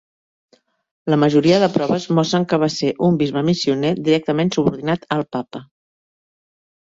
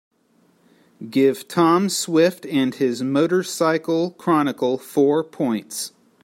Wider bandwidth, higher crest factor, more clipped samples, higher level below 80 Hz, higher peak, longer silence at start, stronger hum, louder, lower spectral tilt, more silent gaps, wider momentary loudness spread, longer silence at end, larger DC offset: second, 7.8 kHz vs 16.5 kHz; about the same, 16 dB vs 16 dB; neither; first, -58 dBFS vs -70 dBFS; about the same, -2 dBFS vs -4 dBFS; about the same, 1.05 s vs 1 s; neither; about the same, -18 LUFS vs -20 LUFS; first, -6.5 dB/octave vs -5 dB/octave; neither; about the same, 9 LU vs 8 LU; first, 1.25 s vs 0.35 s; neither